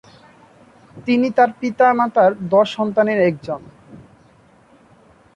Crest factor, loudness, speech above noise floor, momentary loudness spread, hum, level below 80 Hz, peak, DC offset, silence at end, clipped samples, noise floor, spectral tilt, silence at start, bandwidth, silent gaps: 16 dB; -17 LUFS; 35 dB; 13 LU; none; -60 dBFS; -4 dBFS; under 0.1%; 1.35 s; under 0.1%; -51 dBFS; -7 dB/octave; 0.95 s; 9.6 kHz; none